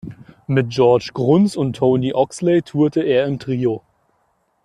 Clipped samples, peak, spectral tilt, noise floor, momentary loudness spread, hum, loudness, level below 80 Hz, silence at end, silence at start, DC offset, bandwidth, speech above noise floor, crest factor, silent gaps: under 0.1%; -2 dBFS; -7.5 dB/octave; -64 dBFS; 7 LU; none; -18 LUFS; -54 dBFS; 0.85 s; 0.05 s; under 0.1%; 11.5 kHz; 48 dB; 16 dB; none